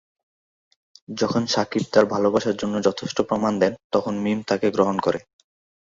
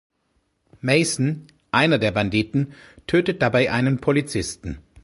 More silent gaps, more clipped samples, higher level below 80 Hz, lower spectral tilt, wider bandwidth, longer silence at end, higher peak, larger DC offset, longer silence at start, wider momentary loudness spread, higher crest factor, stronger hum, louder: first, 3.84-3.90 s vs none; neither; second, -58 dBFS vs -46 dBFS; about the same, -5.5 dB/octave vs -5 dB/octave; second, 7.8 kHz vs 11.5 kHz; first, 0.75 s vs 0.25 s; about the same, -2 dBFS vs -2 dBFS; neither; first, 1.1 s vs 0.85 s; second, 6 LU vs 12 LU; about the same, 20 dB vs 20 dB; neither; about the same, -22 LUFS vs -21 LUFS